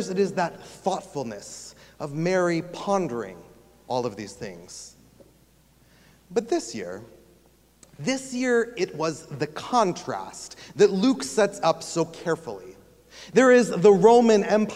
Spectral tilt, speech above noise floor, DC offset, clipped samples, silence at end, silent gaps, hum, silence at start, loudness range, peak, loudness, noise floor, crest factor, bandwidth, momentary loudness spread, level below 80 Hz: -5 dB/octave; 35 dB; under 0.1%; under 0.1%; 0 s; none; none; 0 s; 13 LU; -4 dBFS; -23 LUFS; -59 dBFS; 20 dB; 14.5 kHz; 22 LU; -62 dBFS